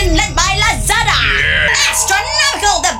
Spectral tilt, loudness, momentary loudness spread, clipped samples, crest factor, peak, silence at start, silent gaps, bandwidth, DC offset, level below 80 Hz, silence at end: -1.5 dB/octave; -11 LUFS; 2 LU; under 0.1%; 12 dB; 0 dBFS; 0 s; none; 16.5 kHz; under 0.1%; -22 dBFS; 0 s